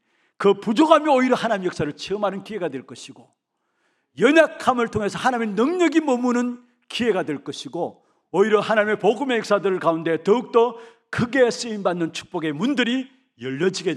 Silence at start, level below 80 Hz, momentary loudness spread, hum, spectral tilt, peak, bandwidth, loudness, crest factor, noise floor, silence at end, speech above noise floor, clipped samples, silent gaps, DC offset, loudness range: 0.4 s; -62 dBFS; 13 LU; none; -5 dB/octave; -2 dBFS; 12 kHz; -21 LUFS; 20 dB; -71 dBFS; 0 s; 50 dB; under 0.1%; none; under 0.1%; 3 LU